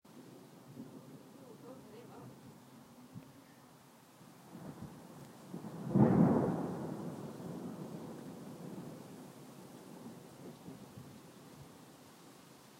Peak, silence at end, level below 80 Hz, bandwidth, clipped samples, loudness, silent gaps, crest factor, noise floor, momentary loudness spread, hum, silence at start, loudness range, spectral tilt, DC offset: -14 dBFS; 0 s; -70 dBFS; 16 kHz; under 0.1%; -37 LUFS; none; 26 dB; -60 dBFS; 23 LU; none; 0.05 s; 20 LU; -8 dB/octave; under 0.1%